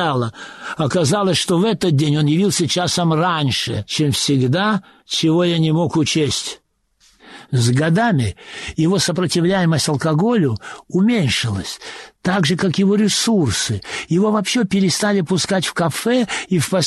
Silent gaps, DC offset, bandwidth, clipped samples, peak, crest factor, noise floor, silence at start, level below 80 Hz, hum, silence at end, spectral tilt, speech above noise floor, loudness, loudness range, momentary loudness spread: none; under 0.1%; 12.5 kHz; under 0.1%; -6 dBFS; 12 dB; -58 dBFS; 0 s; -50 dBFS; none; 0 s; -5 dB/octave; 41 dB; -17 LUFS; 2 LU; 8 LU